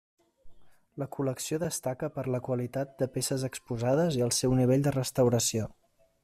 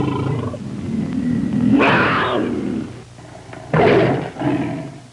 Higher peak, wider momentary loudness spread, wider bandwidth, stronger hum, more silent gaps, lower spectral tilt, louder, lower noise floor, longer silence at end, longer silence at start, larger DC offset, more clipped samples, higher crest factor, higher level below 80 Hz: second, -14 dBFS vs -6 dBFS; second, 10 LU vs 20 LU; first, 15 kHz vs 11 kHz; neither; neither; second, -5 dB/octave vs -7 dB/octave; second, -29 LUFS vs -18 LUFS; first, -49 dBFS vs -38 dBFS; first, 0.5 s vs 0.05 s; first, 0.45 s vs 0 s; neither; neither; about the same, 16 dB vs 12 dB; second, -58 dBFS vs -46 dBFS